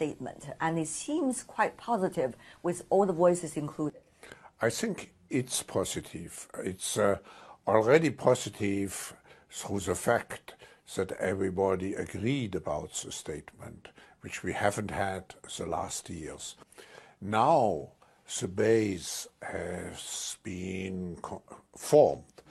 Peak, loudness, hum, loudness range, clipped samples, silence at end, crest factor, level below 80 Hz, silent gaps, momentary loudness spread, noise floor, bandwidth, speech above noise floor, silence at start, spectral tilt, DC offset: -8 dBFS; -31 LUFS; none; 6 LU; under 0.1%; 0.3 s; 24 dB; -62 dBFS; none; 18 LU; -53 dBFS; 13 kHz; 22 dB; 0 s; -4.5 dB/octave; under 0.1%